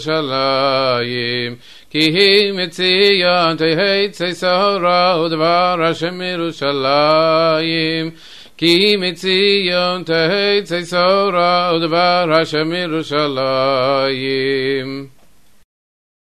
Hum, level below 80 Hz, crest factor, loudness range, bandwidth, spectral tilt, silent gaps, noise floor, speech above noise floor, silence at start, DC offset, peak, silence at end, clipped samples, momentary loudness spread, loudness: none; -58 dBFS; 14 dB; 2 LU; 13.5 kHz; -5 dB/octave; none; -53 dBFS; 38 dB; 0 s; 0.6%; -2 dBFS; 1.15 s; under 0.1%; 8 LU; -15 LUFS